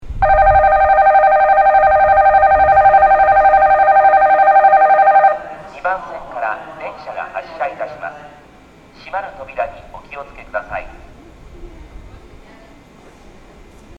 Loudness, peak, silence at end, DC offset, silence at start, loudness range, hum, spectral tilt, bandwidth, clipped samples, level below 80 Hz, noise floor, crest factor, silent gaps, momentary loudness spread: -11 LUFS; 0 dBFS; 2.3 s; under 0.1%; 0.05 s; 19 LU; none; -6 dB/octave; 5 kHz; under 0.1%; -34 dBFS; -43 dBFS; 14 dB; none; 19 LU